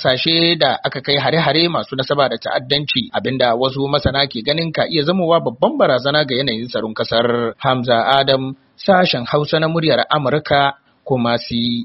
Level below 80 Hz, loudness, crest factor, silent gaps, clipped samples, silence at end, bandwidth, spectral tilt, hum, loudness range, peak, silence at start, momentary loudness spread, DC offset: -46 dBFS; -16 LUFS; 16 dB; none; under 0.1%; 0 s; 6 kHz; -3 dB/octave; none; 1 LU; 0 dBFS; 0 s; 6 LU; under 0.1%